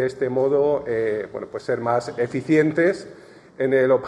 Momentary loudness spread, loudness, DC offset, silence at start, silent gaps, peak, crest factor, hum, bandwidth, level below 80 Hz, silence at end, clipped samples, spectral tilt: 11 LU; -22 LUFS; under 0.1%; 0 s; none; -6 dBFS; 16 dB; none; 12 kHz; -62 dBFS; 0 s; under 0.1%; -7 dB/octave